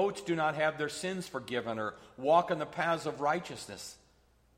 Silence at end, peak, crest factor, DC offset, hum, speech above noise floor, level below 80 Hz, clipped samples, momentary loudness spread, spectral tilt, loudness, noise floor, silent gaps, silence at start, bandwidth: 0.6 s; -14 dBFS; 20 dB; under 0.1%; none; 34 dB; -68 dBFS; under 0.1%; 15 LU; -4.5 dB/octave; -33 LUFS; -66 dBFS; none; 0 s; 16 kHz